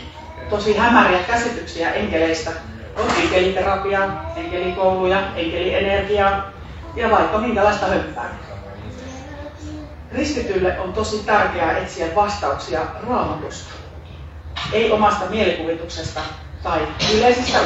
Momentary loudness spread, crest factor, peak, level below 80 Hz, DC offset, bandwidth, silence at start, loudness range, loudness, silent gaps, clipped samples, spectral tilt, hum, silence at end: 18 LU; 20 dB; 0 dBFS; -38 dBFS; under 0.1%; 8.4 kHz; 0 s; 5 LU; -19 LUFS; none; under 0.1%; -4.5 dB/octave; none; 0 s